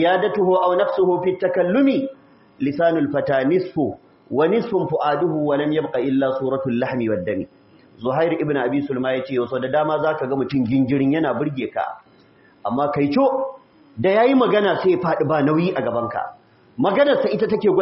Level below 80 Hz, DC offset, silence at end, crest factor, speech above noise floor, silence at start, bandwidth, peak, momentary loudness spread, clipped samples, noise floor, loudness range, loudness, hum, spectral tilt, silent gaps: -60 dBFS; under 0.1%; 0 s; 14 dB; 33 dB; 0 s; 5.8 kHz; -6 dBFS; 9 LU; under 0.1%; -52 dBFS; 3 LU; -20 LUFS; none; -5.5 dB/octave; none